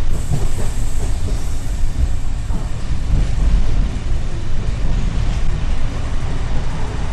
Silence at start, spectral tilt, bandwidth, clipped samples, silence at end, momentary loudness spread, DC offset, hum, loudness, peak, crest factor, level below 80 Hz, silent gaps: 0 s; -6 dB/octave; 9.4 kHz; under 0.1%; 0 s; 5 LU; under 0.1%; none; -23 LUFS; -4 dBFS; 12 dB; -18 dBFS; none